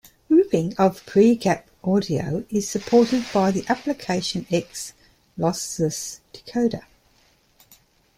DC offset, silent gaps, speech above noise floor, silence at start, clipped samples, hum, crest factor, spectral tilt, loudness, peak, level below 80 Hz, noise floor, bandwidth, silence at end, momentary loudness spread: under 0.1%; none; 38 dB; 0.3 s; under 0.1%; none; 18 dB; -5.5 dB/octave; -22 LUFS; -6 dBFS; -56 dBFS; -60 dBFS; 16 kHz; 1.35 s; 14 LU